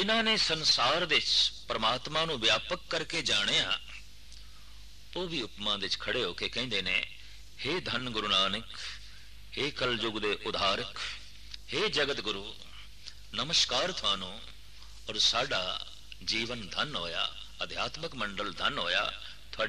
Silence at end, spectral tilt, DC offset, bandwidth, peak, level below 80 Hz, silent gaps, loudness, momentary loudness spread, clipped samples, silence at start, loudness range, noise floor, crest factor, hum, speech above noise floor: 0 s; -2 dB/octave; 0.5%; 14 kHz; -14 dBFS; -54 dBFS; none; -30 LUFS; 18 LU; under 0.1%; 0 s; 6 LU; -52 dBFS; 18 dB; none; 21 dB